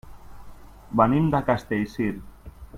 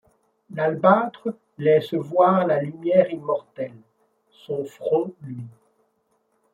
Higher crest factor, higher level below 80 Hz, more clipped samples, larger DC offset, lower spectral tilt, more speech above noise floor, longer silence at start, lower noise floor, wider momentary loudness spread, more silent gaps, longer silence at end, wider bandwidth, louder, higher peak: about the same, 20 dB vs 20 dB; first, -46 dBFS vs -70 dBFS; neither; neither; about the same, -8.5 dB/octave vs -8.5 dB/octave; second, 20 dB vs 47 dB; second, 0.05 s vs 0.5 s; second, -43 dBFS vs -69 dBFS; second, 9 LU vs 17 LU; neither; second, 0 s vs 1.05 s; first, 16 kHz vs 7.4 kHz; about the same, -24 LUFS vs -22 LUFS; about the same, -4 dBFS vs -2 dBFS